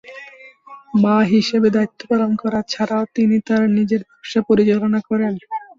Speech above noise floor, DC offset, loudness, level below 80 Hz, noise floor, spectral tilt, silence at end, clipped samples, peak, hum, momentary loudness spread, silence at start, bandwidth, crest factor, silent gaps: 25 dB; under 0.1%; -18 LUFS; -56 dBFS; -42 dBFS; -6.5 dB/octave; 0.15 s; under 0.1%; -4 dBFS; none; 8 LU; 0.05 s; 7.4 kHz; 14 dB; none